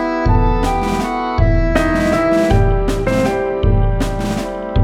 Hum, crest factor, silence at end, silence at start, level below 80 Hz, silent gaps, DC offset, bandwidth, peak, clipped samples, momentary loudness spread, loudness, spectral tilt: none; 14 dB; 0 s; 0 s; -20 dBFS; none; under 0.1%; 13.5 kHz; -2 dBFS; under 0.1%; 5 LU; -16 LUFS; -7 dB/octave